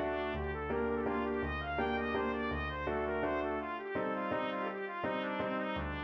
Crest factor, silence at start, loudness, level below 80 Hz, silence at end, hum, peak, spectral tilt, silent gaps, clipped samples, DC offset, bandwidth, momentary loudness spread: 14 dB; 0 s; -36 LUFS; -50 dBFS; 0 s; none; -22 dBFS; -8 dB/octave; none; under 0.1%; under 0.1%; 6 kHz; 3 LU